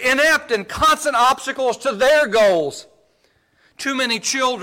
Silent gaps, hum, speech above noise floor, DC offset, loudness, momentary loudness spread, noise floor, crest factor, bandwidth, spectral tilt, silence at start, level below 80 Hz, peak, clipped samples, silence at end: none; none; 43 dB; under 0.1%; -17 LUFS; 9 LU; -61 dBFS; 10 dB; 17 kHz; -2 dB/octave; 0 s; -48 dBFS; -8 dBFS; under 0.1%; 0 s